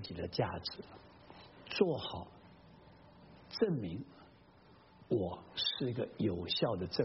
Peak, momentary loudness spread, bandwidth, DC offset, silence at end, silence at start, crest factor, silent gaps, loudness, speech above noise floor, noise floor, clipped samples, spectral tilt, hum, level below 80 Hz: -14 dBFS; 22 LU; 5.8 kHz; under 0.1%; 0 s; 0 s; 24 dB; none; -37 LUFS; 25 dB; -62 dBFS; under 0.1%; -4.5 dB/octave; none; -64 dBFS